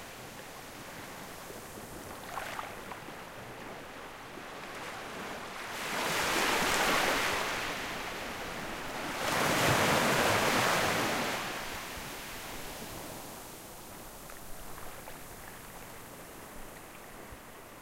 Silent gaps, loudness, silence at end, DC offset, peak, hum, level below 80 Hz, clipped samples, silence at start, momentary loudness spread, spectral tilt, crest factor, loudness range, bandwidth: none; -32 LUFS; 0 s; under 0.1%; -14 dBFS; none; -54 dBFS; under 0.1%; 0 s; 19 LU; -2.5 dB/octave; 20 dB; 17 LU; 16 kHz